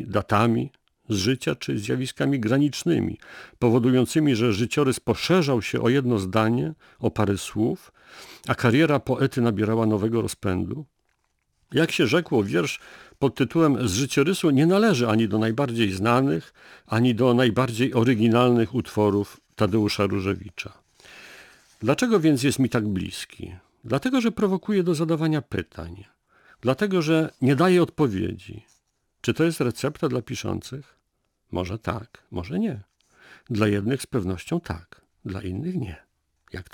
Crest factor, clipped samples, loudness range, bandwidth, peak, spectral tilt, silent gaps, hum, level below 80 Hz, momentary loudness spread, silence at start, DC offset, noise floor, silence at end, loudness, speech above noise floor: 18 dB; under 0.1%; 7 LU; 19 kHz; -6 dBFS; -6 dB/octave; none; none; -54 dBFS; 16 LU; 0 s; under 0.1%; -74 dBFS; 0.1 s; -23 LUFS; 51 dB